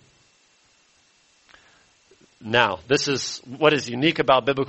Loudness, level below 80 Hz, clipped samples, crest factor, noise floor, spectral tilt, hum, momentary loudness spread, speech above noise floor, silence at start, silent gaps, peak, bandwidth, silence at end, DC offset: -21 LUFS; -58 dBFS; under 0.1%; 22 dB; -60 dBFS; -4 dB/octave; none; 7 LU; 39 dB; 2.4 s; none; -2 dBFS; 8.4 kHz; 0 s; under 0.1%